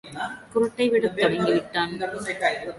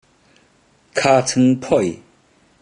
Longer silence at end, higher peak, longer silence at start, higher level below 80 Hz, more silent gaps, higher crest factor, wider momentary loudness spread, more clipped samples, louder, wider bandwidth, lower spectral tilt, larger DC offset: second, 0 s vs 0.65 s; second, -8 dBFS vs -2 dBFS; second, 0.05 s vs 0.95 s; about the same, -60 dBFS vs -56 dBFS; neither; about the same, 16 dB vs 18 dB; second, 8 LU vs 11 LU; neither; second, -24 LUFS vs -17 LUFS; about the same, 11.5 kHz vs 10.5 kHz; about the same, -5 dB/octave vs -5 dB/octave; neither